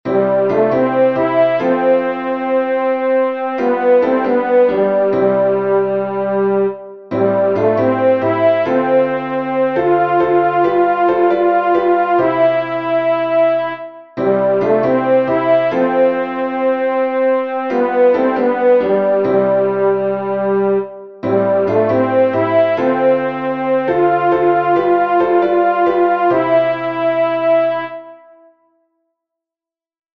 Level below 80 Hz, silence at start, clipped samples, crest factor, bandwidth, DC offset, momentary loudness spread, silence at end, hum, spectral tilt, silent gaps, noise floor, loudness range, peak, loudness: -60 dBFS; 0.05 s; under 0.1%; 12 dB; 5.8 kHz; 0.2%; 5 LU; 2 s; none; -8.5 dB/octave; none; -89 dBFS; 2 LU; -2 dBFS; -14 LUFS